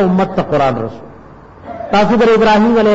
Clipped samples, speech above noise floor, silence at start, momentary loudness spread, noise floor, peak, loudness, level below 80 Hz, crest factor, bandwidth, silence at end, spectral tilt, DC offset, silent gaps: under 0.1%; 26 dB; 0 s; 16 LU; -37 dBFS; -4 dBFS; -12 LUFS; -38 dBFS; 10 dB; 8 kHz; 0 s; -7 dB/octave; under 0.1%; none